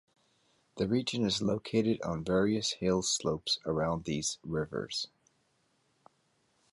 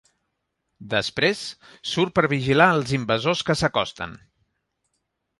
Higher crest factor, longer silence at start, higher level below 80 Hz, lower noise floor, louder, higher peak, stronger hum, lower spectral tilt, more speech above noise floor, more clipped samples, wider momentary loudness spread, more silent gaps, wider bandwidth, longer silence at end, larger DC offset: about the same, 18 dB vs 22 dB; about the same, 0.75 s vs 0.8 s; about the same, -58 dBFS vs -54 dBFS; about the same, -74 dBFS vs -77 dBFS; second, -32 LUFS vs -22 LUFS; second, -16 dBFS vs -4 dBFS; neither; about the same, -4.5 dB/octave vs -5 dB/octave; second, 42 dB vs 55 dB; neither; second, 6 LU vs 15 LU; neither; about the same, 11.5 kHz vs 11.5 kHz; first, 1.65 s vs 1.25 s; neither